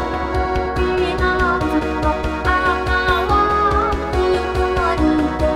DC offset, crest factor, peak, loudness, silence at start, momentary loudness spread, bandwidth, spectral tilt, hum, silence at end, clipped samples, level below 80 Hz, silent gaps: 0.3%; 16 dB; -2 dBFS; -18 LUFS; 0 s; 4 LU; 13 kHz; -6.5 dB/octave; none; 0 s; under 0.1%; -26 dBFS; none